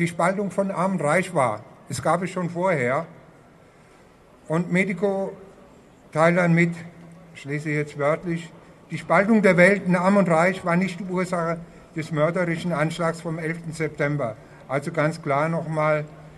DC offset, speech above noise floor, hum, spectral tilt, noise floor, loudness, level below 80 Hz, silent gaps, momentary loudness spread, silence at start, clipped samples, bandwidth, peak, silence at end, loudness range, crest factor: under 0.1%; 29 dB; none; -6.5 dB/octave; -52 dBFS; -23 LUFS; -60 dBFS; none; 14 LU; 0 s; under 0.1%; 12 kHz; -2 dBFS; 0 s; 6 LU; 20 dB